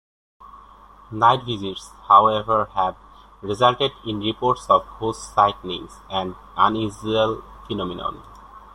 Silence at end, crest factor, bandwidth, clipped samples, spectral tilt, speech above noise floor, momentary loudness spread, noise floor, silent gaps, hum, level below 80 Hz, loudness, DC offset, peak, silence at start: 0.15 s; 20 dB; 12 kHz; under 0.1%; -5.5 dB/octave; 26 dB; 15 LU; -47 dBFS; none; none; -48 dBFS; -21 LUFS; under 0.1%; -2 dBFS; 0.4 s